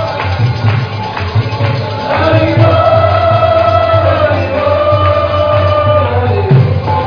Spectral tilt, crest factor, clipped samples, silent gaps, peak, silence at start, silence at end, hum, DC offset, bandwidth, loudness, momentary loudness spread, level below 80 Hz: -8 dB/octave; 10 dB; 0.3%; none; 0 dBFS; 0 s; 0 s; none; under 0.1%; 5.4 kHz; -11 LUFS; 6 LU; -34 dBFS